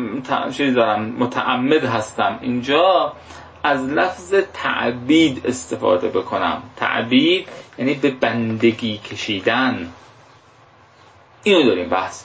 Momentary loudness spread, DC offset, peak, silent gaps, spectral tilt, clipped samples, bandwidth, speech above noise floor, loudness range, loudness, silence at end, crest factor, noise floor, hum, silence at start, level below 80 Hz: 9 LU; under 0.1%; -2 dBFS; none; -5 dB/octave; under 0.1%; 8 kHz; 31 dB; 3 LU; -19 LUFS; 0 s; 16 dB; -49 dBFS; none; 0 s; -54 dBFS